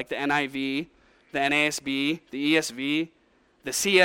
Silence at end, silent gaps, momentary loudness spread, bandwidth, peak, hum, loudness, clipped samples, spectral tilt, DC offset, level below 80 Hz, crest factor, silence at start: 0 s; none; 11 LU; 17.5 kHz; -6 dBFS; none; -26 LUFS; under 0.1%; -3 dB/octave; under 0.1%; -64 dBFS; 20 dB; 0 s